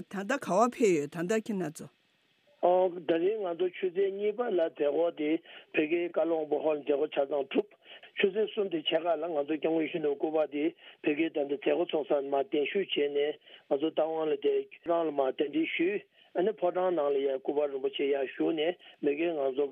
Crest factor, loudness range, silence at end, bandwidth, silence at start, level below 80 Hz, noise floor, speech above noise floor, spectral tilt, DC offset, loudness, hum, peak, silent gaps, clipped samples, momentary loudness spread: 18 dB; 1 LU; 0 s; 12.5 kHz; 0 s; -86 dBFS; -70 dBFS; 40 dB; -5 dB/octave; under 0.1%; -30 LUFS; none; -12 dBFS; none; under 0.1%; 5 LU